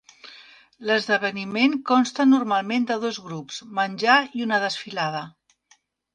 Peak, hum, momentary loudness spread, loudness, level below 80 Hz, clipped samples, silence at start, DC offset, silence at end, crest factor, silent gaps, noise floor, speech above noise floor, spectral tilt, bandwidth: -4 dBFS; none; 15 LU; -22 LUFS; -72 dBFS; under 0.1%; 0.25 s; under 0.1%; 0.85 s; 20 dB; none; -62 dBFS; 40 dB; -4 dB/octave; 9.4 kHz